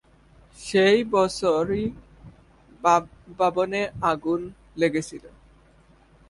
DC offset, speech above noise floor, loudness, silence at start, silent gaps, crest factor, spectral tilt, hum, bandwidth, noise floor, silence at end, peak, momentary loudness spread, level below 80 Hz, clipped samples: under 0.1%; 33 dB; -23 LUFS; 0.6 s; none; 20 dB; -5 dB/octave; none; 11.5 kHz; -56 dBFS; 1 s; -6 dBFS; 18 LU; -54 dBFS; under 0.1%